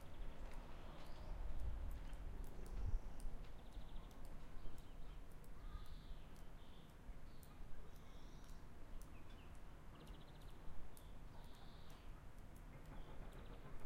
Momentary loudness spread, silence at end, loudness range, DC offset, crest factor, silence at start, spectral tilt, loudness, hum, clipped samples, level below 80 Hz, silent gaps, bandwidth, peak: 10 LU; 0 s; 7 LU; under 0.1%; 18 dB; 0 s; -6 dB/octave; -58 LUFS; none; under 0.1%; -52 dBFS; none; 15.5 kHz; -30 dBFS